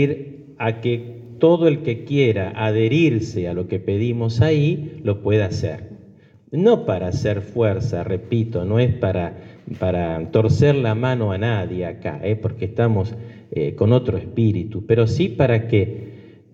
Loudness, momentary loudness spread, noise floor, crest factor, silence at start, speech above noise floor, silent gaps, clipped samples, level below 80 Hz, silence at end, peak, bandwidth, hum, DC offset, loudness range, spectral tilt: -20 LUFS; 11 LU; -48 dBFS; 16 dB; 0 s; 29 dB; none; under 0.1%; -48 dBFS; 0.25 s; -4 dBFS; 7.6 kHz; none; under 0.1%; 2 LU; -8 dB/octave